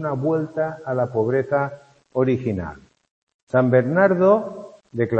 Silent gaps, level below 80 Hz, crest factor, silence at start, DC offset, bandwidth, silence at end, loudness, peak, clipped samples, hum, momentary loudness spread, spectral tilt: 3.11-3.27 s, 3.34-3.47 s; -56 dBFS; 18 dB; 0 s; under 0.1%; 8 kHz; 0 s; -21 LUFS; -4 dBFS; under 0.1%; none; 13 LU; -9.5 dB/octave